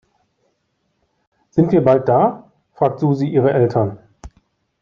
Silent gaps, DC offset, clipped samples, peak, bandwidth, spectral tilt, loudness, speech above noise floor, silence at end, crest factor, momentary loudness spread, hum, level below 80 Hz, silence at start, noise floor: none; under 0.1%; under 0.1%; -2 dBFS; 7.2 kHz; -10 dB/octave; -16 LUFS; 53 dB; 0.55 s; 16 dB; 9 LU; none; -50 dBFS; 1.55 s; -68 dBFS